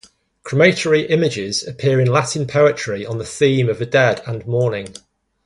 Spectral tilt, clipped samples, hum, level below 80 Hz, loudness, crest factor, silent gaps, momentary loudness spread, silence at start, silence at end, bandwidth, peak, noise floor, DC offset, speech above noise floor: -5.5 dB/octave; under 0.1%; none; -54 dBFS; -17 LUFS; 18 dB; none; 10 LU; 0.45 s; 0.55 s; 11.5 kHz; 0 dBFS; -40 dBFS; under 0.1%; 23 dB